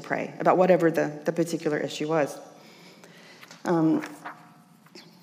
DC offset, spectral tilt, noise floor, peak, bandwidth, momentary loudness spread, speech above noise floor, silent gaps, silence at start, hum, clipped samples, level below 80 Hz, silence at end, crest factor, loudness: under 0.1%; -6 dB/octave; -54 dBFS; -8 dBFS; 15.5 kHz; 20 LU; 30 dB; none; 0 s; none; under 0.1%; -90 dBFS; 0.2 s; 20 dB; -25 LUFS